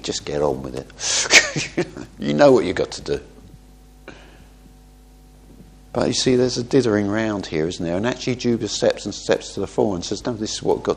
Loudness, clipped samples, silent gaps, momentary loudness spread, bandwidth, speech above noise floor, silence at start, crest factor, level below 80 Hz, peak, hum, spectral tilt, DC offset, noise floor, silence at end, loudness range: -20 LUFS; under 0.1%; none; 13 LU; 15 kHz; 26 dB; 0 s; 22 dB; -46 dBFS; 0 dBFS; none; -3.5 dB/octave; under 0.1%; -47 dBFS; 0 s; 8 LU